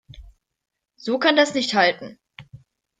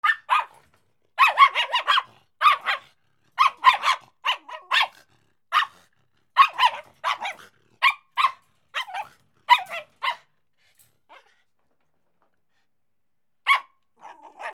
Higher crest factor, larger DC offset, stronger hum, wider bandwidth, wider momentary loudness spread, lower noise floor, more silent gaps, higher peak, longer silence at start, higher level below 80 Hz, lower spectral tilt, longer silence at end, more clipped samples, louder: about the same, 20 dB vs 24 dB; neither; neither; second, 9.6 kHz vs 16 kHz; about the same, 17 LU vs 17 LU; second, -49 dBFS vs -83 dBFS; neither; about the same, -4 dBFS vs -2 dBFS; about the same, 0.15 s vs 0.05 s; first, -54 dBFS vs -82 dBFS; first, -3.5 dB/octave vs 1.5 dB/octave; first, 0.45 s vs 0 s; neither; first, -19 LUFS vs -22 LUFS